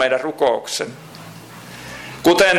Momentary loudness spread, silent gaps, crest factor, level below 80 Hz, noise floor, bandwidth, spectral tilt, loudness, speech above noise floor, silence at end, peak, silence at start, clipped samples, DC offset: 20 LU; none; 14 dB; -54 dBFS; -38 dBFS; 17 kHz; -3 dB/octave; -19 LUFS; 21 dB; 0 s; -4 dBFS; 0 s; under 0.1%; under 0.1%